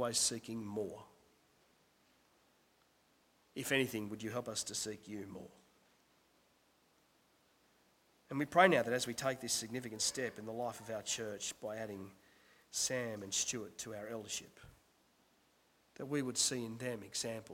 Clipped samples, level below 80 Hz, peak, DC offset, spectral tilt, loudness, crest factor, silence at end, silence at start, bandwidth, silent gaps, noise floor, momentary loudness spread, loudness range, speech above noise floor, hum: under 0.1%; -76 dBFS; -12 dBFS; under 0.1%; -2.5 dB/octave; -38 LUFS; 28 dB; 0 s; 0 s; 16.5 kHz; none; -73 dBFS; 14 LU; 11 LU; 34 dB; none